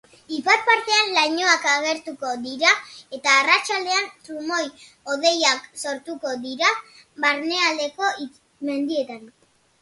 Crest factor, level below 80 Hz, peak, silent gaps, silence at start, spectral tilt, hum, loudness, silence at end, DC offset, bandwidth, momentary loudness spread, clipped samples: 20 dB; -72 dBFS; -2 dBFS; none; 0.3 s; 0 dB/octave; none; -20 LUFS; 0.55 s; under 0.1%; 11.5 kHz; 15 LU; under 0.1%